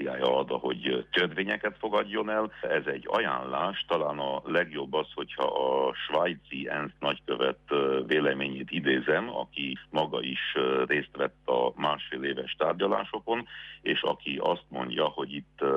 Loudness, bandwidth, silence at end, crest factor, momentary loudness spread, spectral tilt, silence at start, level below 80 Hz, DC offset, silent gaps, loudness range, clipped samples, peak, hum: -29 LUFS; 7.2 kHz; 0 s; 16 dB; 6 LU; -6.5 dB/octave; 0 s; -64 dBFS; under 0.1%; none; 1 LU; under 0.1%; -12 dBFS; none